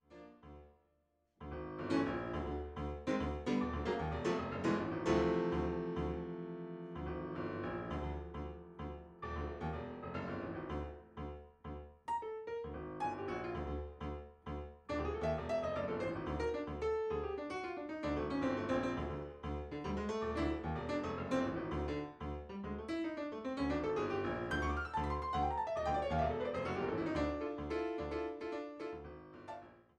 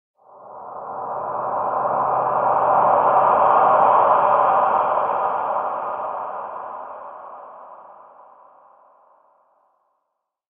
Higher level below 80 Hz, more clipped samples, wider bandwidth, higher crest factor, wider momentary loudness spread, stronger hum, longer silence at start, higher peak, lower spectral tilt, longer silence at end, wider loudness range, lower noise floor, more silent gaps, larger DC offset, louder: first, -50 dBFS vs -66 dBFS; neither; first, 9.6 kHz vs 3.7 kHz; about the same, 18 dB vs 18 dB; second, 12 LU vs 21 LU; neither; second, 0.1 s vs 0.4 s; second, -22 dBFS vs -2 dBFS; second, -7 dB/octave vs -9 dB/octave; second, 0.2 s vs 2.65 s; second, 7 LU vs 17 LU; about the same, -78 dBFS vs -77 dBFS; neither; neither; second, -40 LUFS vs -19 LUFS